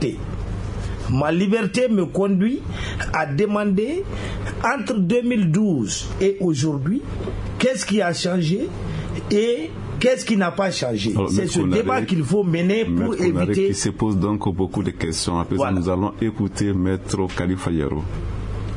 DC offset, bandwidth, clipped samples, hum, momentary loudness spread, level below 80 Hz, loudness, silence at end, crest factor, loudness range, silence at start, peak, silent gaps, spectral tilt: under 0.1%; 11 kHz; under 0.1%; none; 9 LU; -38 dBFS; -21 LUFS; 0 s; 16 dB; 2 LU; 0 s; -6 dBFS; none; -6 dB/octave